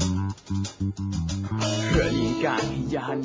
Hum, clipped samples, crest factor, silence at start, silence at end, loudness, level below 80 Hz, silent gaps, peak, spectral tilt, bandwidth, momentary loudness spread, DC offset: none; under 0.1%; 16 dB; 0 s; 0 s; -26 LUFS; -38 dBFS; none; -10 dBFS; -5.5 dB/octave; 8 kHz; 7 LU; under 0.1%